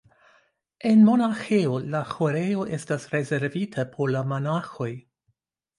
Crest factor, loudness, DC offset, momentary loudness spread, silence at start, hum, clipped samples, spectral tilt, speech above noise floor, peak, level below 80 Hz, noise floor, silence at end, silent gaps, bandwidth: 16 dB; -24 LUFS; under 0.1%; 12 LU; 0.85 s; none; under 0.1%; -7.5 dB/octave; 50 dB; -8 dBFS; -66 dBFS; -73 dBFS; 0.8 s; none; 11 kHz